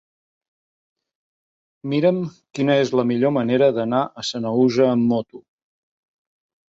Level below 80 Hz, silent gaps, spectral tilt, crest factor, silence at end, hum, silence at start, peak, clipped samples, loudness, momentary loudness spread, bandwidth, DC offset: -66 dBFS; none; -6.5 dB/octave; 18 dB; 1.35 s; none; 1.85 s; -4 dBFS; under 0.1%; -20 LUFS; 9 LU; 7.8 kHz; under 0.1%